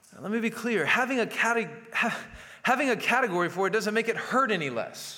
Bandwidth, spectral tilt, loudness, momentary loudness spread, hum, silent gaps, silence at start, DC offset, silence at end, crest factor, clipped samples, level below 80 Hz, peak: 17 kHz; -4 dB/octave; -27 LUFS; 7 LU; none; none; 0.1 s; under 0.1%; 0 s; 18 dB; under 0.1%; -66 dBFS; -10 dBFS